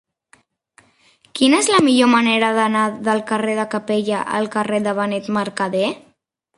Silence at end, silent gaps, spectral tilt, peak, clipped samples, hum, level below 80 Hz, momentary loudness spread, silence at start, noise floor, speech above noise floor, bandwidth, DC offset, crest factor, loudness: 0.6 s; none; -4 dB/octave; -2 dBFS; under 0.1%; none; -64 dBFS; 8 LU; 1.35 s; -62 dBFS; 45 dB; 11.5 kHz; under 0.1%; 18 dB; -18 LUFS